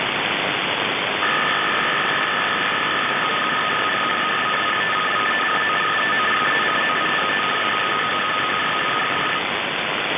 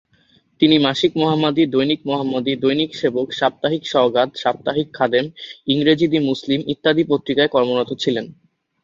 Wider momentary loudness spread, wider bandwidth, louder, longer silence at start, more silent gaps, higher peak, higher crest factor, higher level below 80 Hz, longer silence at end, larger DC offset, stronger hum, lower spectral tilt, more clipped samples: second, 2 LU vs 6 LU; second, 4 kHz vs 7.6 kHz; about the same, -19 LUFS vs -18 LUFS; second, 0 s vs 0.6 s; neither; second, -6 dBFS vs -2 dBFS; about the same, 14 dB vs 16 dB; about the same, -58 dBFS vs -58 dBFS; second, 0 s vs 0.5 s; neither; neither; about the same, -6.5 dB/octave vs -6 dB/octave; neither